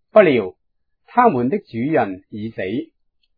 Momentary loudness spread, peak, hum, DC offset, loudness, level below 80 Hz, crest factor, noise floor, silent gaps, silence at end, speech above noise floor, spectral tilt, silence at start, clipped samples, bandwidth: 16 LU; 0 dBFS; none; under 0.1%; -19 LUFS; -60 dBFS; 20 dB; -71 dBFS; none; 0.55 s; 54 dB; -10.5 dB/octave; 0.15 s; under 0.1%; 5 kHz